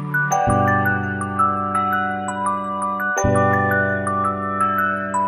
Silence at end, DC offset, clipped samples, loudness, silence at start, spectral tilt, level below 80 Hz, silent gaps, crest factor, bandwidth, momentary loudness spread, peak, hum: 0 s; under 0.1%; under 0.1%; -19 LUFS; 0 s; -6 dB/octave; -44 dBFS; none; 14 dB; 15 kHz; 6 LU; -6 dBFS; none